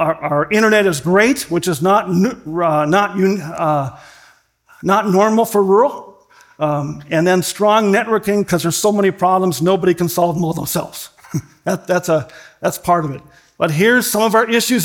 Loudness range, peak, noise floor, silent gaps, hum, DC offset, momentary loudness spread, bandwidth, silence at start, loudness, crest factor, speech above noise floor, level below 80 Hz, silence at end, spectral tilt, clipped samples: 4 LU; 0 dBFS; -51 dBFS; none; none; under 0.1%; 10 LU; 18 kHz; 0 s; -15 LUFS; 16 dB; 35 dB; -52 dBFS; 0 s; -5 dB/octave; under 0.1%